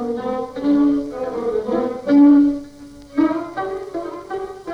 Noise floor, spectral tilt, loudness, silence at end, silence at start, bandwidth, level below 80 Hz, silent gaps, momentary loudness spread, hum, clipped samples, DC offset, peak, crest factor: -39 dBFS; -7 dB/octave; -19 LUFS; 0 s; 0 s; 6.4 kHz; -50 dBFS; none; 17 LU; none; under 0.1%; under 0.1%; -4 dBFS; 14 dB